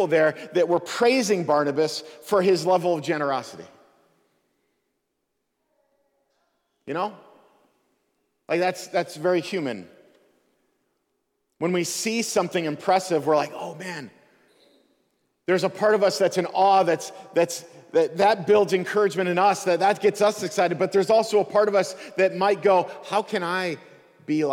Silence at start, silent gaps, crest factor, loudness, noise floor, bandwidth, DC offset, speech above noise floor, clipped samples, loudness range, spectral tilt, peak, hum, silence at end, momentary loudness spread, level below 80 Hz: 0 s; none; 16 dB; -23 LUFS; -77 dBFS; 17 kHz; under 0.1%; 55 dB; under 0.1%; 11 LU; -4.5 dB/octave; -8 dBFS; none; 0 s; 10 LU; -72 dBFS